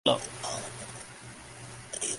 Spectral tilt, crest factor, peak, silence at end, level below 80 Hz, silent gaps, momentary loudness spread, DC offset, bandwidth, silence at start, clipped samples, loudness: -2.5 dB/octave; 26 dB; -8 dBFS; 0 s; -62 dBFS; none; 14 LU; under 0.1%; 11.5 kHz; 0.05 s; under 0.1%; -36 LUFS